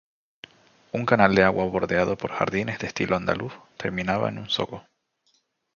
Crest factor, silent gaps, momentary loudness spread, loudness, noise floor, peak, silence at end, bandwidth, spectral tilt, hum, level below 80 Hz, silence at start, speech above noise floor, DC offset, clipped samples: 24 dB; none; 14 LU; -24 LUFS; -69 dBFS; 0 dBFS; 0.95 s; 7.2 kHz; -6 dB/octave; none; -52 dBFS; 0.95 s; 45 dB; under 0.1%; under 0.1%